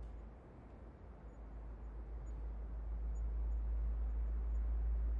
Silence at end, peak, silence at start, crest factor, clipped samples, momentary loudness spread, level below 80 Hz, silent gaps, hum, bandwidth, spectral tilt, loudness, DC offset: 0 s; -32 dBFS; 0 s; 10 dB; under 0.1%; 16 LU; -42 dBFS; none; none; 2.5 kHz; -10 dB/octave; -44 LUFS; under 0.1%